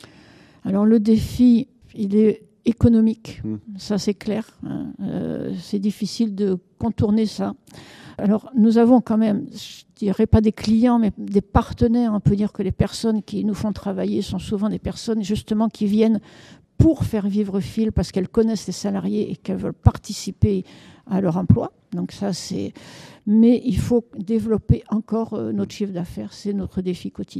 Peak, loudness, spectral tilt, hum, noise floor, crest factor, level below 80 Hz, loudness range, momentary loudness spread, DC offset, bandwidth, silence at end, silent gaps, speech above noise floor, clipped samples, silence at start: 0 dBFS; -21 LUFS; -7.5 dB/octave; none; -49 dBFS; 20 dB; -38 dBFS; 5 LU; 13 LU; under 0.1%; 13 kHz; 0 s; none; 29 dB; under 0.1%; 0.65 s